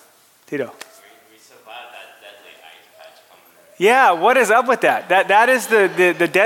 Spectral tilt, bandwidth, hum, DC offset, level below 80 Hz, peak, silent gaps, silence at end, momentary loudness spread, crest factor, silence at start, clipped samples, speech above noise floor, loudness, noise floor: -3.5 dB/octave; 17 kHz; none; under 0.1%; -80 dBFS; -2 dBFS; none; 0 s; 17 LU; 16 dB; 0.5 s; under 0.1%; 37 dB; -15 LUFS; -52 dBFS